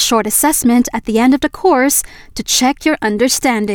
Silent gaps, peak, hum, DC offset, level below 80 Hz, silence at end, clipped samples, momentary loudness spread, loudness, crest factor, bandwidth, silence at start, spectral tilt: none; -2 dBFS; none; under 0.1%; -40 dBFS; 0 s; under 0.1%; 4 LU; -13 LUFS; 12 dB; over 20 kHz; 0 s; -2.5 dB/octave